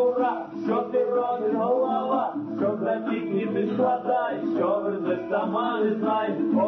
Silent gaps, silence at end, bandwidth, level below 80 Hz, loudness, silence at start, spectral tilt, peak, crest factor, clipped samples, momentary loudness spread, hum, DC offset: none; 0 s; 6 kHz; -72 dBFS; -25 LUFS; 0 s; -5.5 dB/octave; -12 dBFS; 14 dB; under 0.1%; 4 LU; none; under 0.1%